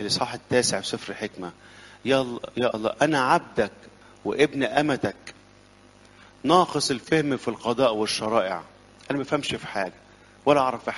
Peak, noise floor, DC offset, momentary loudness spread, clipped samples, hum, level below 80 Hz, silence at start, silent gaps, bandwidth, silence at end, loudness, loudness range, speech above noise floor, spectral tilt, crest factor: -4 dBFS; -53 dBFS; under 0.1%; 12 LU; under 0.1%; 50 Hz at -60 dBFS; -60 dBFS; 0 s; none; 11.5 kHz; 0 s; -25 LUFS; 2 LU; 29 dB; -4 dB/octave; 22 dB